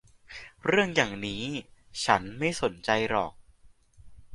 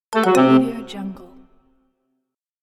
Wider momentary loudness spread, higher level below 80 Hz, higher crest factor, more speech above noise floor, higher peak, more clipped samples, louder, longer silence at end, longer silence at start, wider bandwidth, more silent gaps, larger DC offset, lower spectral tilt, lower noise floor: about the same, 16 LU vs 18 LU; about the same, -56 dBFS vs -56 dBFS; first, 26 dB vs 18 dB; second, 30 dB vs 59 dB; about the same, -4 dBFS vs -2 dBFS; neither; second, -28 LUFS vs -16 LUFS; second, 0 s vs 1.4 s; first, 0.3 s vs 0.1 s; second, 11.5 kHz vs 14 kHz; neither; neither; second, -4 dB/octave vs -6 dB/octave; second, -57 dBFS vs -76 dBFS